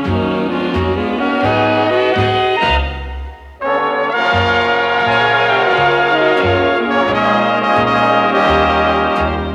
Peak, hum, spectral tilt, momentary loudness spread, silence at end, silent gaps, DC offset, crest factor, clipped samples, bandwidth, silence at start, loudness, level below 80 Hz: 0 dBFS; none; -6 dB/octave; 5 LU; 0 s; none; under 0.1%; 14 dB; under 0.1%; 11 kHz; 0 s; -14 LUFS; -32 dBFS